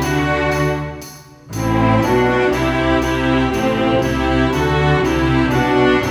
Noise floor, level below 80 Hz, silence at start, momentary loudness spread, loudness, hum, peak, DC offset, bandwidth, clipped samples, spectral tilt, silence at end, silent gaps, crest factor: -36 dBFS; -30 dBFS; 0 s; 7 LU; -16 LUFS; none; -4 dBFS; under 0.1%; over 20 kHz; under 0.1%; -6 dB/octave; 0 s; none; 12 dB